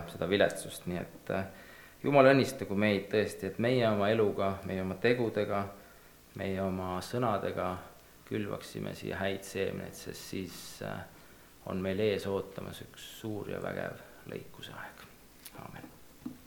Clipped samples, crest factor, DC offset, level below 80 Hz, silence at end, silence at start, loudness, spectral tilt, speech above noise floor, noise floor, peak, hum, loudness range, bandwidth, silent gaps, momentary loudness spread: under 0.1%; 26 dB; under 0.1%; -64 dBFS; 0 s; 0 s; -32 LUFS; -5.5 dB/octave; 24 dB; -56 dBFS; -8 dBFS; none; 11 LU; 19 kHz; none; 20 LU